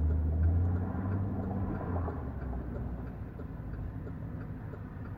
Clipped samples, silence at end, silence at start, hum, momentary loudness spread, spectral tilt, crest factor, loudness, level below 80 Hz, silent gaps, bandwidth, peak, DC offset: under 0.1%; 0 s; 0 s; none; 13 LU; -11.5 dB/octave; 14 dB; -36 LUFS; -38 dBFS; none; 2.8 kHz; -20 dBFS; under 0.1%